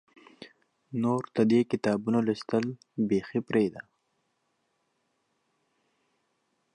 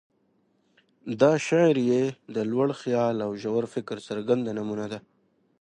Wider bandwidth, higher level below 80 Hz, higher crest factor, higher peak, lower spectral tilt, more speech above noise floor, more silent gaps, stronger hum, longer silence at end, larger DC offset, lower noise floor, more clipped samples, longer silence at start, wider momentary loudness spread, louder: about the same, 10 kHz vs 10 kHz; about the same, -70 dBFS vs -70 dBFS; about the same, 20 dB vs 20 dB; second, -12 dBFS vs -8 dBFS; about the same, -7.5 dB/octave vs -6.5 dB/octave; first, 49 dB vs 43 dB; neither; neither; first, 2.95 s vs 0.6 s; neither; first, -76 dBFS vs -68 dBFS; neither; second, 0.4 s vs 1.05 s; second, 8 LU vs 13 LU; about the same, -28 LUFS vs -26 LUFS